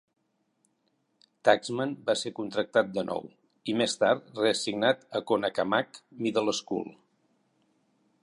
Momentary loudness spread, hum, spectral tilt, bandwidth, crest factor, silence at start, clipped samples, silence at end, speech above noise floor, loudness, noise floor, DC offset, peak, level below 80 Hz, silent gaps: 10 LU; none; -4 dB/octave; 11.5 kHz; 24 dB; 1.45 s; under 0.1%; 1.3 s; 46 dB; -28 LUFS; -74 dBFS; under 0.1%; -6 dBFS; -74 dBFS; none